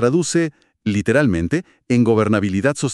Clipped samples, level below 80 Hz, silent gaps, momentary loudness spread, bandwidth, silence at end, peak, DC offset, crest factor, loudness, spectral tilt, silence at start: under 0.1%; -46 dBFS; none; 8 LU; 12 kHz; 0 s; -2 dBFS; under 0.1%; 14 dB; -18 LUFS; -6 dB/octave; 0 s